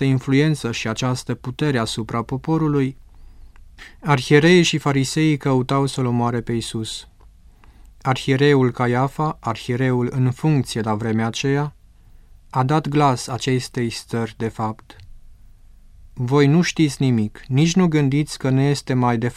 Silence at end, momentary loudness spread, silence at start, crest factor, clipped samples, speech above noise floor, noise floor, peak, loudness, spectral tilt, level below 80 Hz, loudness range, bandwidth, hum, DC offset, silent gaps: 0.05 s; 10 LU; 0 s; 20 dB; under 0.1%; 28 dB; -47 dBFS; 0 dBFS; -20 LUFS; -6 dB/octave; -46 dBFS; 5 LU; 14 kHz; 50 Hz at -45 dBFS; under 0.1%; none